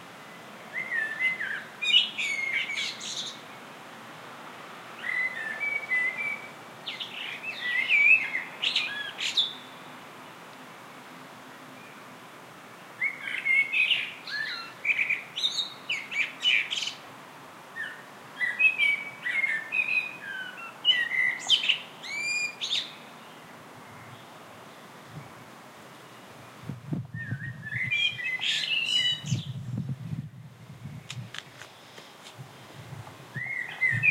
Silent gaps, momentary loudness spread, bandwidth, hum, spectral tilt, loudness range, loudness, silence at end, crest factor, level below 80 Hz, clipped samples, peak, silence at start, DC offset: none; 24 LU; 16 kHz; none; -2 dB/octave; 15 LU; -26 LUFS; 0 s; 22 dB; -72 dBFS; under 0.1%; -10 dBFS; 0 s; under 0.1%